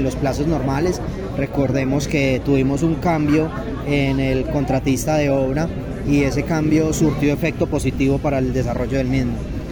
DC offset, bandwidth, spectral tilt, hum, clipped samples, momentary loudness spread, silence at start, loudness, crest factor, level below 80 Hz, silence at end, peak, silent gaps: under 0.1%; over 20 kHz; -6.5 dB/octave; none; under 0.1%; 5 LU; 0 s; -19 LUFS; 12 dB; -32 dBFS; 0 s; -6 dBFS; none